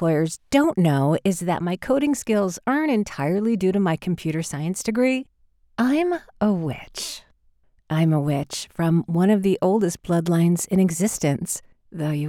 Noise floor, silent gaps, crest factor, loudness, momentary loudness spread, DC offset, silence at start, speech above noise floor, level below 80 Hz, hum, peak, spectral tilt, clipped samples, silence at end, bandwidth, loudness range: -60 dBFS; none; 16 dB; -22 LUFS; 9 LU; under 0.1%; 0 s; 38 dB; -54 dBFS; none; -6 dBFS; -6 dB/octave; under 0.1%; 0 s; 16.5 kHz; 4 LU